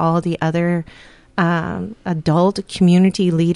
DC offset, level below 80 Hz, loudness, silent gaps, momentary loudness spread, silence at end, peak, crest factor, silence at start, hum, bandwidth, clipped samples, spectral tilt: under 0.1%; -48 dBFS; -18 LUFS; none; 12 LU; 0 s; -4 dBFS; 14 dB; 0 s; none; 11 kHz; under 0.1%; -7 dB/octave